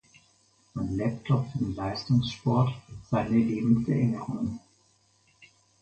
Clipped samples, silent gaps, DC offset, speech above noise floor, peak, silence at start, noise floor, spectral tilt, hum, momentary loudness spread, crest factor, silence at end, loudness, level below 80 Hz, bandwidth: under 0.1%; none; under 0.1%; 39 dB; -10 dBFS; 0.75 s; -66 dBFS; -8 dB/octave; none; 10 LU; 18 dB; 0.35 s; -28 LUFS; -52 dBFS; 8.6 kHz